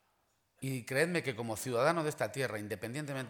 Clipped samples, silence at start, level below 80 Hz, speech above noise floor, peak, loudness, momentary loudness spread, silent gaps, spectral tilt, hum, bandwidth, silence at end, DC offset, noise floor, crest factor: under 0.1%; 0.6 s; -74 dBFS; 42 dB; -14 dBFS; -35 LUFS; 9 LU; none; -5 dB/octave; none; 19.5 kHz; 0 s; under 0.1%; -76 dBFS; 22 dB